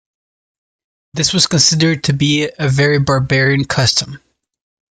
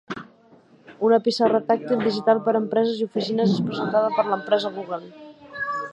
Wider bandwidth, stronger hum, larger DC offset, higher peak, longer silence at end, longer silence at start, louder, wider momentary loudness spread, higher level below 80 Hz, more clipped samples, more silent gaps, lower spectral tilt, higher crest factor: about the same, 9.4 kHz vs 8.6 kHz; neither; neither; first, 0 dBFS vs -4 dBFS; first, 0.75 s vs 0 s; first, 1.15 s vs 0.1 s; first, -13 LUFS vs -22 LUFS; second, 7 LU vs 12 LU; first, -44 dBFS vs -70 dBFS; neither; neither; second, -4 dB/octave vs -6.5 dB/octave; about the same, 16 dB vs 18 dB